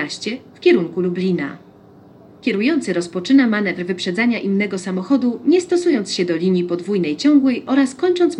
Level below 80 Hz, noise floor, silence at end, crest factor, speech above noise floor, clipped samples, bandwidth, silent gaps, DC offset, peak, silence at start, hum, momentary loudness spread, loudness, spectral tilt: -68 dBFS; -45 dBFS; 0 s; 14 dB; 28 dB; under 0.1%; 11 kHz; none; under 0.1%; -4 dBFS; 0 s; none; 8 LU; -18 LUFS; -5.5 dB/octave